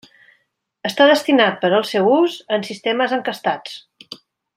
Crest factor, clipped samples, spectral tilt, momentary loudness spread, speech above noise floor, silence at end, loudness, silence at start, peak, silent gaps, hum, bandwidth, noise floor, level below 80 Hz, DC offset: 16 dB; under 0.1%; -4.5 dB/octave; 23 LU; 50 dB; 0.4 s; -17 LUFS; 0.85 s; -2 dBFS; none; none; 16 kHz; -67 dBFS; -70 dBFS; under 0.1%